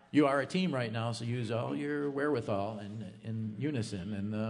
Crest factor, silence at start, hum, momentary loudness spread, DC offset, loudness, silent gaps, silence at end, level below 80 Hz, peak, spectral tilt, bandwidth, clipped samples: 18 dB; 0.15 s; none; 10 LU; under 0.1%; -34 LUFS; none; 0 s; -74 dBFS; -14 dBFS; -6.5 dB/octave; 10.5 kHz; under 0.1%